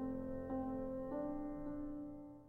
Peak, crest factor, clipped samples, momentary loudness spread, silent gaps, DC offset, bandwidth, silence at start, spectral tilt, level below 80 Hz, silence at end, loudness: -32 dBFS; 12 dB; under 0.1%; 5 LU; none; under 0.1%; 3.1 kHz; 0 s; -10.5 dB/octave; -56 dBFS; 0 s; -45 LUFS